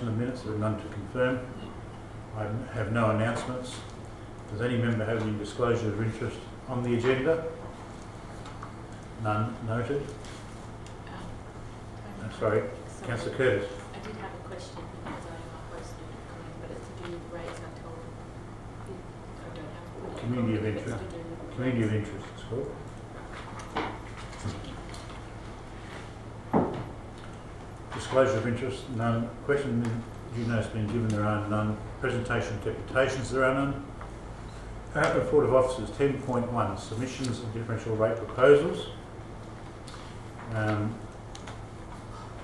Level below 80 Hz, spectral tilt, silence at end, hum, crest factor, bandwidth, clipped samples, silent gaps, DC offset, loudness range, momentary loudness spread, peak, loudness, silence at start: -48 dBFS; -6.5 dB/octave; 0 s; none; 22 dB; 12 kHz; under 0.1%; none; under 0.1%; 11 LU; 17 LU; -8 dBFS; -30 LUFS; 0 s